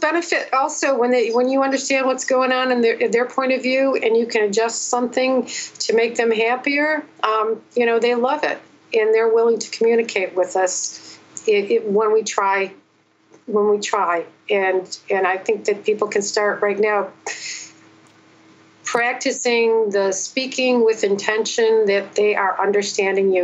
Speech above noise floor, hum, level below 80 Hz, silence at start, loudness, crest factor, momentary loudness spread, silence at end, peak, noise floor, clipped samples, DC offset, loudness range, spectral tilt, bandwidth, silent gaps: 40 dB; none; -80 dBFS; 0 s; -19 LUFS; 18 dB; 7 LU; 0 s; 0 dBFS; -58 dBFS; under 0.1%; under 0.1%; 3 LU; -2.5 dB/octave; 8.4 kHz; none